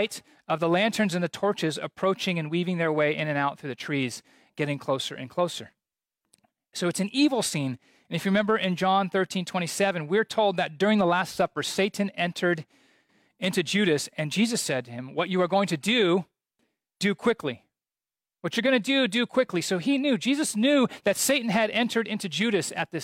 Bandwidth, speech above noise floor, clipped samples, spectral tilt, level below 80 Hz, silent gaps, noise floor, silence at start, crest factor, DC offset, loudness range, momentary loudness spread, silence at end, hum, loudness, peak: 16.5 kHz; over 64 dB; under 0.1%; -4.5 dB/octave; -70 dBFS; none; under -90 dBFS; 0 s; 14 dB; under 0.1%; 4 LU; 8 LU; 0 s; none; -26 LUFS; -12 dBFS